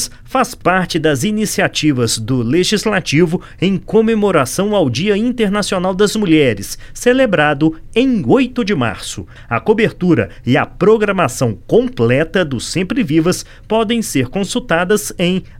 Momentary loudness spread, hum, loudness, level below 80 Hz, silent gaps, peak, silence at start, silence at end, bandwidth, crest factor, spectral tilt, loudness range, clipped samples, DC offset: 6 LU; none; -15 LUFS; -38 dBFS; none; 0 dBFS; 0 s; 0 s; 16.5 kHz; 14 dB; -5 dB/octave; 2 LU; under 0.1%; under 0.1%